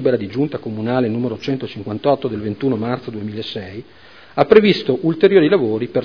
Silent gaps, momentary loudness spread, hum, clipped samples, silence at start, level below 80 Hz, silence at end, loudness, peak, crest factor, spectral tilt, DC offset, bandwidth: none; 15 LU; none; under 0.1%; 0 s; -54 dBFS; 0 s; -18 LUFS; 0 dBFS; 18 dB; -8 dB/octave; 0.4%; 5.4 kHz